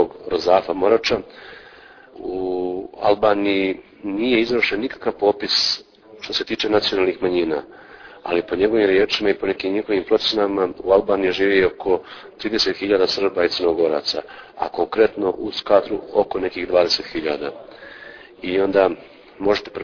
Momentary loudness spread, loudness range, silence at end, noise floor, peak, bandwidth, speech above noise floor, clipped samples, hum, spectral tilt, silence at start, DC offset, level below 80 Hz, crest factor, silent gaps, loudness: 13 LU; 3 LU; 0 s; -45 dBFS; -2 dBFS; 5.4 kHz; 25 dB; under 0.1%; none; -4.5 dB/octave; 0 s; under 0.1%; -52 dBFS; 18 dB; none; -20 LUFS